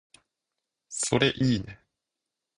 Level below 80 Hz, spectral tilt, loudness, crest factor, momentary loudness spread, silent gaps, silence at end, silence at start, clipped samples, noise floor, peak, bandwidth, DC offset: -56 dBFS; -4 dB/octave; -26 LUFS; 24 dB; 15 LU; none; 0.85 s; 0.9 s; under 0.1%; -86 dBFS; -6 dBFS; 11 kHz; under 0.1%